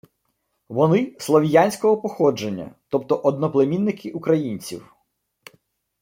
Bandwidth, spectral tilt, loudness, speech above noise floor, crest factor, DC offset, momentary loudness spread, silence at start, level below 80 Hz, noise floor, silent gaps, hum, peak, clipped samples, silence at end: 16.5 kHz; -6.5 dB/octave; -21 LUFS; 53 dB; 18 dB; under 0.1%; 13 LU; 0.7 s; -64 dBFS; -73 dBFS; none; none; -2 dBFS; under 0.1%; 1.2 s